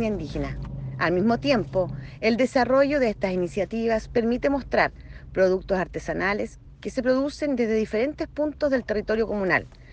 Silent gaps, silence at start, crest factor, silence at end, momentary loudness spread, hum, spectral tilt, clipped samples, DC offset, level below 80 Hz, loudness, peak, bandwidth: none; 0 s; 16 dB; 0 s; 9 LU; none; -6.5 dB/octave; under 0.1%; under 0.1%; -44 dBFS; -25 LUFS; -8 dBFS; 9 kHz